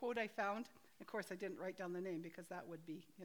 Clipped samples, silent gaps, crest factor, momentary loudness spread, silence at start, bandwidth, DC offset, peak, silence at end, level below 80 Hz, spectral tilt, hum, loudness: under 0.1%; none; 18 dB; 11 LU; 0 s; over 20 kHz; under 0.1%; -30 dBFS; 0 s; -90 dBFS; -5.5 dB/octave; none; -47 LUFS